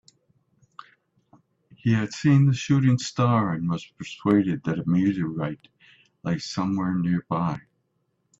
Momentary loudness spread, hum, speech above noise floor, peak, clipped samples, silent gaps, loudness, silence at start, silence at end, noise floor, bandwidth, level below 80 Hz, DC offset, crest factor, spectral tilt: 11 LU; none; 50 dB; -8 dBFS; under 0.1%; none; -24 LUFS; 1.85 s; 0.8 s; -73 dBFS; 8 kHz; -60 dBFS; under 0.1%; 18 dB; -7 dB/octave